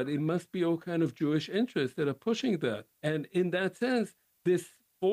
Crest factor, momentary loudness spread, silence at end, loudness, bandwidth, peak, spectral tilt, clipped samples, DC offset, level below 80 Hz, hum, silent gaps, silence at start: 12 dB; 4 LU; 0 s; -31 LUFS; 15.5 kHz; -18 dBFS; -6.5 dB/octave; under 0.1%; under 0.1%; -74 dBFS; none; none; 0 s